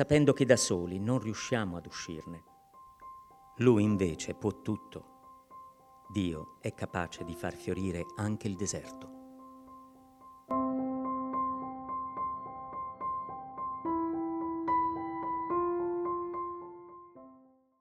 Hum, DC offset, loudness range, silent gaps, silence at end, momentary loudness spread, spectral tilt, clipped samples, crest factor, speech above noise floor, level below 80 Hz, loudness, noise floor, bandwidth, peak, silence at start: none; under 0.1%; 6 LU; none; 0.45 s; 24 LU; -5.5 dB/octave; under 0.1%; 26 dB; 30 dB; -60 dBFS; -33 LUFS; -61 dBFS; 14.5 kHz; -8 dBFS; 0 s